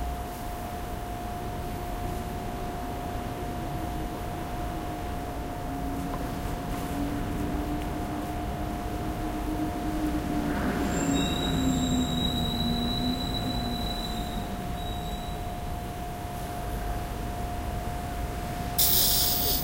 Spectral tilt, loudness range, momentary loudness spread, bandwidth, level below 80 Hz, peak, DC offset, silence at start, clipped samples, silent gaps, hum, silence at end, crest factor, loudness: -4.5 dB/octave; 7 LU; 9 LU; 16 kHz; -36 dBFS; -10 dBFS; under 0.1%; 0 s; under 0.1%; none; none; 0 s; 20 dB; -30 LUFS